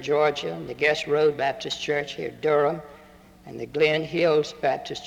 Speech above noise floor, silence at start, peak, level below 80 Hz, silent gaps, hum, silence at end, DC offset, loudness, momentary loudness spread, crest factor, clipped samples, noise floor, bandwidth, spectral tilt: 26 dB; 0 s; -8 dBFS; -60 dBFS; none; none; 0 s; under 0.1%; -24 LUFS; 11 LU; 16 dB; under 0.1%; -50 dBFS; 10.5 kHz; -4.5 dB/octave